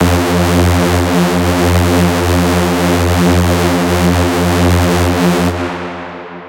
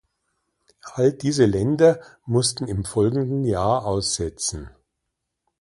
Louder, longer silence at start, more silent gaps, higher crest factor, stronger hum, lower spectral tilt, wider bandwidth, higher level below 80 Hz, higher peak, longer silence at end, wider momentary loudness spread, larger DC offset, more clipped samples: first, -12 LUFS vs -21 LUFS; second, 0 s vs 0.85 s; neither; second, 12 dB vs 20 dB; neither; about the same, -5.5 dB/octave vs -5 dB/octave; first, 17.5 kHz vs 11.5 kHz; first, -28 dBFS vs -44 dBFS; first, 0 dBFS vs -4 dBFS; second, 0 s vs 0.9 s; second, 5 LU vs 9 LU; neither; neither